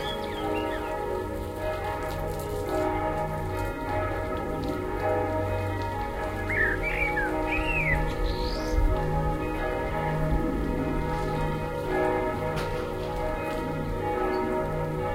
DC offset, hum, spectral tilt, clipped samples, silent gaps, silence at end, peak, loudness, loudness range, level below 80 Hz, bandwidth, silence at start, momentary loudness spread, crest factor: under 0.1%; none; -6.5 dB/octave; under 0.1%; none; 0 s; -12 dBFS; -29 LUFS; 3 LU; -34 dBFS; 16 kHz; 0 s; 5 LU; 16 dB